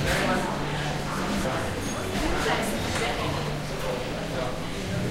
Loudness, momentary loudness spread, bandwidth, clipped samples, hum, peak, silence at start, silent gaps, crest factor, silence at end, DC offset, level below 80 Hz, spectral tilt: -28 LUFS; 5 LU; 16 kHz; under 0.1%; none; -12 dBFS; 0 s; none; 14 dB; 0 s; under 0.1%; -38 dBFS; -4.5 dB/octave